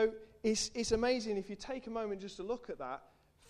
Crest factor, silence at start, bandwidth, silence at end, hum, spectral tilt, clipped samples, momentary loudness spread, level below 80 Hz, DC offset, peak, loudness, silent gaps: 18 dB; 0 s; 12.5 kHz; 0.45 s; none; -3.5 dB/octave; under 0.1%; 11 LU; -58 dBFS; under 0.1%; -20 dBFS; -37 LUFS; none